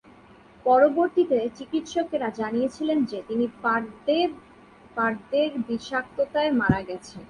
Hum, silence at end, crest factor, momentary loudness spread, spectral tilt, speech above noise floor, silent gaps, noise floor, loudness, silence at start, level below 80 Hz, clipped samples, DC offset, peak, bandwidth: none; 0.05 s; 18 dB; 8 LU; -6 dB/octave; 27 dB; none; -51 dBFS; -25 LUFS; 0.65 s; -54 dBFS; under 0.1%; under 0.1%; -6 dBFS; 10.5 kHz